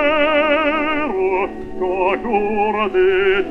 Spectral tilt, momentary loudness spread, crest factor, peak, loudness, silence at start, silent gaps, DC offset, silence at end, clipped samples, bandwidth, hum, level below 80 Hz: -6.5 dB/octave; 7 LU; 14 dB; -2 dBFS; -17 LUFS; 0 s; none; under 0.1%; 0 s; under 0.1%; 5.8 kHz; none; -40 dBFS